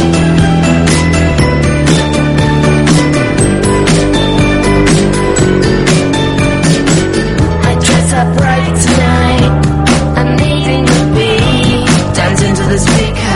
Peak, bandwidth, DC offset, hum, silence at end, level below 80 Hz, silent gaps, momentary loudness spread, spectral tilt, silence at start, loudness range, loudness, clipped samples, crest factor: 0 dBFS; 11.5 kHz; under 0.1%; none; 0 s; -20 dBFS; none; 2 LU; -5.5 dB/octave; 0 s; 1 LU; -9 LUFS; 0.2%; 8 dB